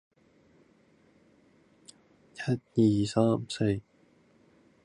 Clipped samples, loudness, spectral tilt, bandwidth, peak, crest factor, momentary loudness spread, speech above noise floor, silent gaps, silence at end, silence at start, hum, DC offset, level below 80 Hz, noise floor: under 0.1%; -28 LUFS; -7 dB/octave; 11 kHz; -10 dBFS; 22 dB; 11 LU; 37 dB; none; 1.05 s; 2.35 s; none; under 0.1%; -60 dBFS; -64 dBFS